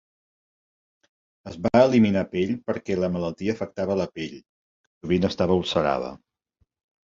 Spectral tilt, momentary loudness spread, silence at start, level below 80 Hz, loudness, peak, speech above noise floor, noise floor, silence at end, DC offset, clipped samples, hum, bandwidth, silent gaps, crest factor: -7 dB/octave; 15 LU; 1.45 s; -50 dBFS; -24 LUFS; -4 dBFS; 48 dB; -71 dBFS; 0.85 s; under 0.1%; under 0.1%; none; 7.6 kHz; 4.49-5.01 s; 22 dB